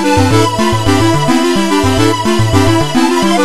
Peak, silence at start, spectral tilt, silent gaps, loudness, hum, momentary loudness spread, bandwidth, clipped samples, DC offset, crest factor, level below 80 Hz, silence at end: 0 dBFS; 0 s; -5 dB/octave; none; -11 LUFS; none; 1 LU; 13 kHz; under 0.1%; 7%; 10 dB; -32 dBFS; 0 s